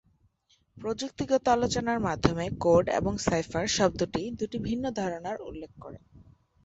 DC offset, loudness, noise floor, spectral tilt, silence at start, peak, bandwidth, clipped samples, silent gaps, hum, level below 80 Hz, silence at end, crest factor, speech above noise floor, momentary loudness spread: under 0.1%; -28 LUFS; -69 dBFS; -5 dB/octave; 0.75 s; -6 dBFS; 8.2 kHz; under 0.1%; none; none; -50 dBFS; 0.45 s; 24 dB; 40 dB; 15 LU